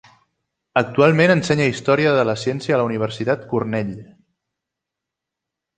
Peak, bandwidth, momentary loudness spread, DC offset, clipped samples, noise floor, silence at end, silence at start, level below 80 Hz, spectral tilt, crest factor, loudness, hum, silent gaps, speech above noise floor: -2 dBFS; 9.4 kHz; 9 LU; under 0.1%; under 0.1%; -84 dBFS; 1.75 s; 0.75 s; -58 dBFS; -6 dB/octave; 18 dB; -18 LUFS; none; none; 66 dB